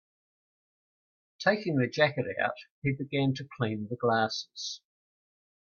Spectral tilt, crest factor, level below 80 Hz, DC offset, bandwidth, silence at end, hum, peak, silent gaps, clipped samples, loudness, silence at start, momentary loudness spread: -5.5 dB/octave; 22 dB; -70 dBFS; under 0.1%; 7 kHz; 0.95 s; none; -10 dBFS; 2.70-2.82 s; under 0.1%; -30 LUFS; 1.4 s; 9 LU